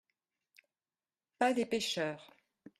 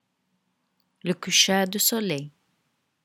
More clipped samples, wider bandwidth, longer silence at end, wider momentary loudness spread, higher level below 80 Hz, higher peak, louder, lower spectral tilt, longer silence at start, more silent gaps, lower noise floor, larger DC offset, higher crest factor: neither; second, 14 kHz vs 18 kHz; second, 0.55 s vs 0.75 s; second, 8 LU vs 13 LU; about the same, -80 dBFS vs -76 dBFS; second, -16 dBFS vs -4 dBFS; second, -34 LUFS vs -22 LUFS; first, -3.5 dB/octave vs -2 dB/octave; first, 1.4 s vs 1.05 s; neither; first, under -90 dBFS vs -74 dBFS; neither; about the same, 24 dB vs 24 dB